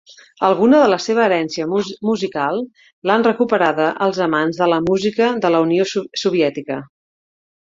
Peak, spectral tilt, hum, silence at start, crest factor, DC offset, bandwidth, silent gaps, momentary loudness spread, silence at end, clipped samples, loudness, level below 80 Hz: 0 dBFS; -5.5 dB/octave; none; 0.1 s; 16 dB; under 0.1%; 7.8 kHz; 2.93-3.02 s; 7 LU; 0.8 s; under 0.1%; -17 LUFS; -58 dBFS